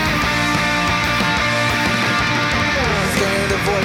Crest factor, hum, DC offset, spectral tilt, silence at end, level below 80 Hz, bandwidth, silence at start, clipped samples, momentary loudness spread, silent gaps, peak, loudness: 14 dB; none; under 0.1%; -4 dB/octave; 0 s; -34 dBFS; over 20 kHz; 0 s; under 0.1%; 1 LU; none; -4 dBFS; -16 LUFS